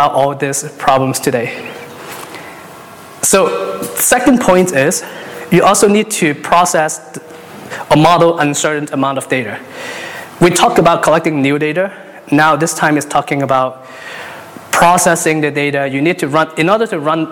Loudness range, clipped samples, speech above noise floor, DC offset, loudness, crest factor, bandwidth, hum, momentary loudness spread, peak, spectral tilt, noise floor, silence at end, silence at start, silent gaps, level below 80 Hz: 4 LU; under 0.1%; 21 dB; under 0.1%; -12 LUFS; 12 dB; 19 kHz; none; 19 LU; 0 dBFS; -4 dB/octave; -34 dBFS; 0 s; 0 s; none; -46 dBFS